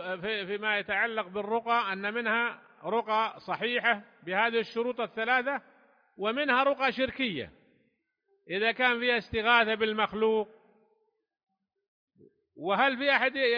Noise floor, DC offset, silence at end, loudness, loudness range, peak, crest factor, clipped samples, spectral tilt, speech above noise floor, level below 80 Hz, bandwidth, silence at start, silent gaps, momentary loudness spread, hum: -76 dBFS; under 0.1%; 0 s; -28 LUFS; 3 LU; -8 dBFS; 22 dB; under 0.1%; -5.5 dB/octave; 48 dB; -66 dBFS; 5.2 kHz; 0 s; 11.88-12.08 s; 9 LU; none